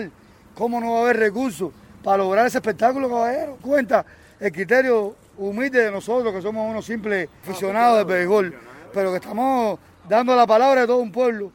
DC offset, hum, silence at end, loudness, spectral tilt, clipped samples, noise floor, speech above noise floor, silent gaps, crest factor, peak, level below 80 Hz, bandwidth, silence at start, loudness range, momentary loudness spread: under 0.1%; none; 0.05 s; -20 LUFS; -5.5 dB/octave; under 0.1%; -47 dBFS; 27 dB; none; 18 dB; -2 dBFS; -60 dBFS; 17 kHz; 0 s; 3 LU; 12 LU